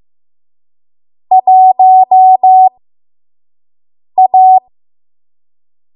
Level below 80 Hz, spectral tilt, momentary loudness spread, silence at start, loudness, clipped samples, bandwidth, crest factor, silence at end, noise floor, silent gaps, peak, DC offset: -72 dBFS; -9 dB/octave; 6 LU; 1.3 s; -7 LUFS; under 0.1%; 1 kHz; 10 dB; 1.35 s; under -90 dBFS; none; 0 dBFS; under 0.1%